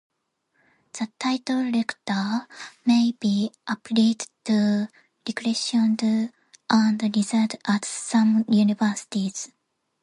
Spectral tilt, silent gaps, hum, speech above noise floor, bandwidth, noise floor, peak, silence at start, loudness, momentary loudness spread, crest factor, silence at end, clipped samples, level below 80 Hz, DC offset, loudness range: -4.5 dB/octave; none; none; 50 dB; 11 kHz; -72 dBFS; -6 dBFS; 0.95 s; -24 LUFS; 13 LU; 18 dB; 0.55 s; under 0.1%; -72 dBFS; under 0.1%; 3 LU